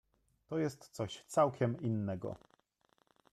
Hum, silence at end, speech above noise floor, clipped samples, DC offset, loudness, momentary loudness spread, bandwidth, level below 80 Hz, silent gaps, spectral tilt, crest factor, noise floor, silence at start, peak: none; 0.95 s; 40 dB; under 0.1%; under 0.1%; -37 LUFS; 11 LU; 13.5 kHz; -72 dBFS; none; -6.5 dB/octave; 20 dB; -75 dBFS; 0.5 s; -18 dBFS